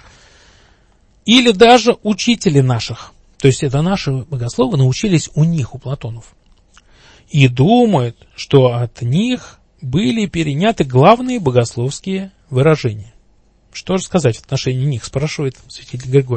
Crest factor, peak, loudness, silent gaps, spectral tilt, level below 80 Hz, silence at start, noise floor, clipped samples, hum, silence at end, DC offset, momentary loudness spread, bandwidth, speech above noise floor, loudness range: 16 dB; 0 dBFS; -15 LUFS; none; -6 dB/octave; -42 dBFS; 1.25 s; -52 dBFS; under 0.1%; none; 0 s; under 0.1%; 15 LU; 8.8 kHz; 38 dB; 5 LU